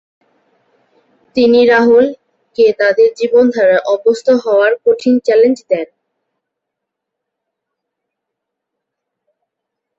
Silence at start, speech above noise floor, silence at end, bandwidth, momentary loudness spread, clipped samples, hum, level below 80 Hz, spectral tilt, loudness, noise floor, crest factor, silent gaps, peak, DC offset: 1.35 s; 68 dB; 4.15 s; 7.8 kHz; 9 LU; under 0.1%; none; -60 dBFS; -5 dB/octave; -11 LUFS; -78 dBFS; 12 dB; none; -2 dBFS; under 0.1%